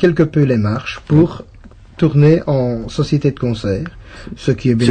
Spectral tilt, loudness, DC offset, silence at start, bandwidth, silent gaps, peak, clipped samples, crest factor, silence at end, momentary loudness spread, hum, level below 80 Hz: -8 dB/octave; -15 LUFS; under 0.1%; 0 s; 9.2 kHz; none; 0 dBFS; under 0.1%; 14 dB; 0 s; 11 LU; none; -38 dBFS